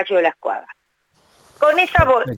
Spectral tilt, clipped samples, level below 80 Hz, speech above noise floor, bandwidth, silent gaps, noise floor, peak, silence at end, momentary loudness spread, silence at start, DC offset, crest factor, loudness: -6 dB/octave; under 0.1%; -36 dBFS; 45 dB; 17 kHz; none; -62 dBFS; 0 dBFS; 0 s; 12 LU; 0 s; under 0.1%; 18 dB; -16 LUFS